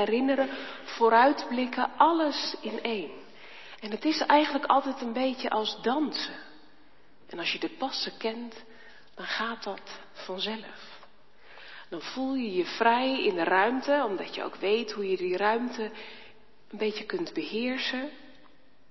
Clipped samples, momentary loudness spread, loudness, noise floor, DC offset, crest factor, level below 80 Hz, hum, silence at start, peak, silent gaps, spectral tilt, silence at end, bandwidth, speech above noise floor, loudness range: under 0.1%; 21 LU; -28 LUFS; -61 dBFS; 0.3%; 22 dB; -74 dBFS; none; 0 s; -6 dBFS; none; -4 dB/octave; 0.6 s; 6.2 kHz; 33 dB; 9 LU